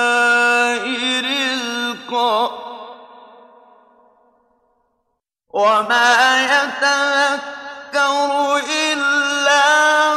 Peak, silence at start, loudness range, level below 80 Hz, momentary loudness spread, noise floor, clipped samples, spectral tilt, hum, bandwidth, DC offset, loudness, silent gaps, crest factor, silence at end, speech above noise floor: -4 dBFS; 0 s; 10 LU; -72 dBFS; 11 LU; -72 dBFS; under 0.1%; -0.5 dB/octave; none; 14.5 kHz; under 0.1%; -15 LUFS; none; 14 dB; 0 s; 57 dB